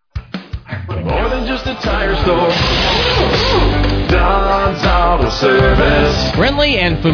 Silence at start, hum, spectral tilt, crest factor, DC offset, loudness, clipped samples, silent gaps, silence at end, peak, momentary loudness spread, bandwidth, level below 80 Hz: 0.15 s; none; -5.5 dB/octave; 12 dB; under 0.1%; -13 LUFS; under 0.1%; none; 0 s; -2 dBFS; 11 LU; 5.4 kHz; -20 dBFS